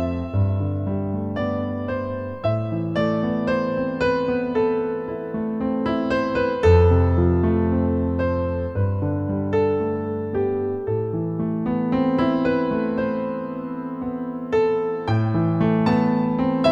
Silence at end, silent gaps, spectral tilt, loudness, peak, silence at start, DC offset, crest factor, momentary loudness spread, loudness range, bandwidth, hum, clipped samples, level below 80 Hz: 0 s; none; -9 dB/octave; -22 LUFS; -4 dBFS; 0 s; under 0.1%; 18 dB; 8 LU; 4 LU; 7.2 kHz; none; under 0.1%; -38 dBFS